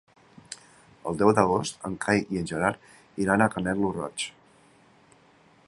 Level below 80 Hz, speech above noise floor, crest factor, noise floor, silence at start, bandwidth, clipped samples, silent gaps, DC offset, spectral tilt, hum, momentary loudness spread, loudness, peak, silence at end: -56 dBFS; 33 dB; 24 dB; -58 dBFS; 0.5 s; 11.5 kHz; under 0.1%; none; under 0.1%; -5 dB/octave; none; 20 LU; -26 LUFS; -2 dBFS; 1.35 s